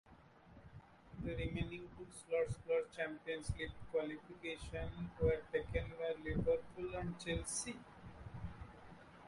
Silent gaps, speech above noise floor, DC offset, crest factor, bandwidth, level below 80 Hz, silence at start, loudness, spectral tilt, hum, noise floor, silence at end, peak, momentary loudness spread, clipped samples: none; 22 dB; under 0.1%; 20 dB; 11.5 kHz; -54 dBFS; 0.05 s; -42 LUFS; -5 dB/octave; none; -63 dBFS; 0 s; -22 dBFS; 20 LU; under 0.1%